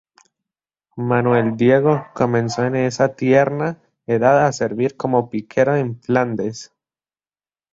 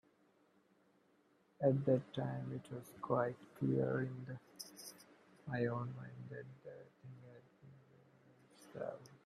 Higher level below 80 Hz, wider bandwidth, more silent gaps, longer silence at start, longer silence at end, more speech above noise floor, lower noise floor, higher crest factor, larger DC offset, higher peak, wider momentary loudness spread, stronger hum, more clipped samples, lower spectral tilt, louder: first, -58 dBFS vs -80 dBFS; second, 7.8 kHz vs 14 kHz; neither; second, 0.95 s vs 1.6 s; first, 1.1 s vs 0.1 s; first, over 73 dB vs 33 dB; first, under -90 dBFS vs -74 dBFS; about the same, 18 dB vs 22 dB; neither; first, -2 dBFS vs -20 dBFS; second, 11 LU vs 21 LU; neither; neither; about the same, -7 dB/octave vs -7.5 dB/octave; first, -18 LUFS vs -41 LUFS